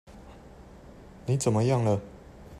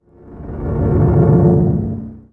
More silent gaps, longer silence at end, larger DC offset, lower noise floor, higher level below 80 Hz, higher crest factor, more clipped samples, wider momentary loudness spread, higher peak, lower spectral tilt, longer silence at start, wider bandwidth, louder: neither; second, 0 s vs 0.15 s; neither; first, -49 dBFS vs -34 dBFS; second, -54 dBFS vs -28 dBFS; about the same, 18 dB vs 14 dB; neither; first, 25 LU vs 17 LU; second, -12 dBFS vs 0 dBFS; second, -6.5 dB/octave vs -13 dB/octave; second, 0.1 s vs 0.25 s; first, 13.5 kHz vs 2.4 kHz; second, -27 LUFS vs -14 LUFS